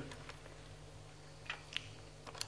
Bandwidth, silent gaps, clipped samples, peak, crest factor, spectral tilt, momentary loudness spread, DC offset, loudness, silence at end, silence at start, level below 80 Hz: 11 kHz; none; under 0.1%; -18 dBFS; 34 dB; -2.5 dB/octave; 12 LU; under 0.1%; -49 LUFS; 0 s; 0 s; -62 dBFS